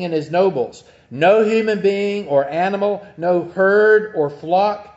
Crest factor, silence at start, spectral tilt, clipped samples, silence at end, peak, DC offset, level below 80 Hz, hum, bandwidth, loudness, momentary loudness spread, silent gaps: 14 dB; 0 s; -6.5 dB/octave; under 0.1%; 0.1 s; -2 dBFS; under 0.1%; -62 dBFS; none; 8 kHz; -17 LUFS; 9 LU; none